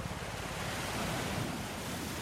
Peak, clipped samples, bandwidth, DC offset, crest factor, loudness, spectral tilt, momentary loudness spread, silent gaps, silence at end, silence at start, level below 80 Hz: -24 dBFS; under 0.1%; 16 kHz; under 0.1%; 14 dB; -37 LUFS; -4 dB/octave; 4 LU; none; 0 s; 0 s; -50 dBFS